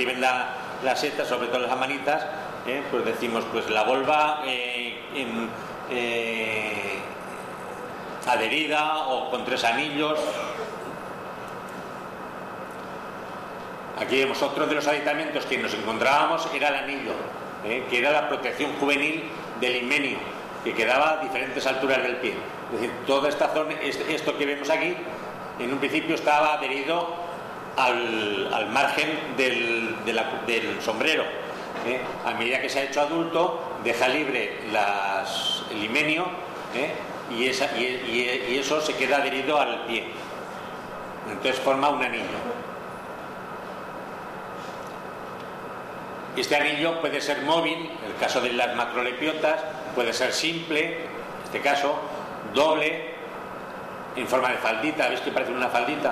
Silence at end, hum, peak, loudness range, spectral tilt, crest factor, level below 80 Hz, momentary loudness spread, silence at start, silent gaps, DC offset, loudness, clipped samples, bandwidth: 0 s; none; -10 dBFS; 4 LU; -3.5 dB/octave; 16 dB; -64 dBFS; 14 LU; 0 s; none; under 0.1%; -25 LUFS; under 0.1%; 14 kHz